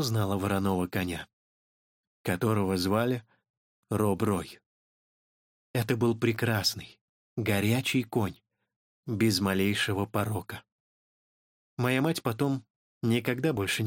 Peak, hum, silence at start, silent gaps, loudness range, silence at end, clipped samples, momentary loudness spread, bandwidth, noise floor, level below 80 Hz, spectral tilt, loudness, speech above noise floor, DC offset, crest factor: -12 dBFS; none; 0 s; 1.33-2.24 s, 3.50-3.83 s, 4.66-5.74 s, 7.01-7.36 s, 8.76-9.03 s, 10.72-11.77 s, 12.70-13.01 s; 3 LU; 0 s; under 0.1%; 12 LU; 17 kHz; under -90 dBFS; -62 dBFS; -5.5 dB/octave; -29 LUFS; over 62 dB; under 0.1%; 18 dB